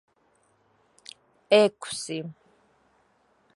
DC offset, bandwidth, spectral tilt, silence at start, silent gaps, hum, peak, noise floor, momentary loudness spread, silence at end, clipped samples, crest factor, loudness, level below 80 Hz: under 0.1%; 11.5 kHz; -3.5 dB/octave; 1.5 s; none; none; -6 dBFS; -67 dBFS; 26 LU; 1.25 s; under 0.1%; 24 dB; -24 LUFS; -76 dBFS